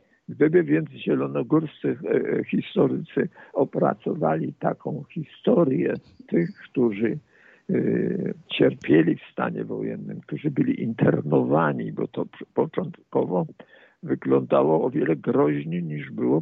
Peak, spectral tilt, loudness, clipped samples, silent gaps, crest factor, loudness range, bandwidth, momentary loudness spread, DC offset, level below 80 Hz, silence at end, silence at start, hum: -6 dBFS; -10 dB/octave; -24 LUFS; under 0.1%; none; 18 dB; 2 LU; 4.8 kHz; 11 LU; under 0.1%; -66 dBFS; 0 s; 0.3 s; none